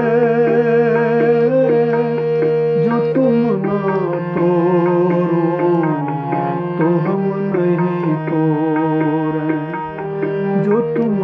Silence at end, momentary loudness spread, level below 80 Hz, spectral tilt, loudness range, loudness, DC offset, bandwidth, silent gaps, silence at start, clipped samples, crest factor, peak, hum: 0 s; 6 LU; -60 dBFS; -10.5 dB/octave; 3 LU; -16 LUFS; under 0.1%; 5.6 kHz; none; 0 s; under 0.1%; 12 dB; -4 dBFS; none